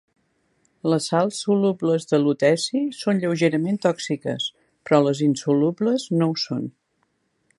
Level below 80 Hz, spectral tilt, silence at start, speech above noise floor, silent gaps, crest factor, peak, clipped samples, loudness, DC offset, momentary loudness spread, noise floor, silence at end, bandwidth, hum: -72 dBFS; -5.5 dB/octave; 0.85 s; 49 dB; none; 20 dB; -2 dBFS; under 0.1%; -22 LUFS; under 0.1%; 8 LU; -70 dBFS; 0.9 s; 11.5 kHz; none